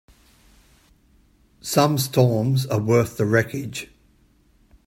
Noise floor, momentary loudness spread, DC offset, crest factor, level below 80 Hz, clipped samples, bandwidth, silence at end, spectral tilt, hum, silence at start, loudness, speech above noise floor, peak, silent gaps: -58 dBFS; 14 LU; under 0.1%; 22 dB; -56 dBFS; under 0.1%; 16.5 kHz; 1 s; -5.5 dB/octave; none; 1.65 s; -21 LUFS; 38 dB; -2 dBFS; none